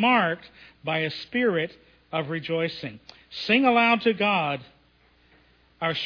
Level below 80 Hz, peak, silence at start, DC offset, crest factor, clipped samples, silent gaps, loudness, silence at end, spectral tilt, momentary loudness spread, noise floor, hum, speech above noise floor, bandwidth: -66 dBFS; -8 dBFS; 0 s; under 0.1%; 18 dB; under 0.1%; none; -24 LUFS; 0 s; -6.5 dB/octave; 15 LU; -61 dBFS; none; 36 dB; 5.4 kHz